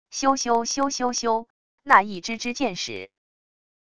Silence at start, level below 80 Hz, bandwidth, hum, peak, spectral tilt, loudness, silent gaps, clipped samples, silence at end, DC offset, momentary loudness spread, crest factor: 0.05 s; -60 dBFS; 11 kHz; none; 0 dBFS; -2 dB/octave; -23 LUFS; 1.50-1.78 s; under 0.1%; 0.7 s; 0.5%; 12 LU; 24 dB